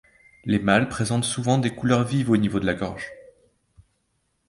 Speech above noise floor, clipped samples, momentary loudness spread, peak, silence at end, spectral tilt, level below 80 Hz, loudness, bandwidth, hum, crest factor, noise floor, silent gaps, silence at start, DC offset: 49 dB; under 0.1%; 11 LU; -4 dBFS; 1.25 s; -5.5 dB/octave; -50 dBFS; -23 LUFS; 11.5 kHz; none; 22 dB; -72 dBFS; none; 0.45 s; under 0.1%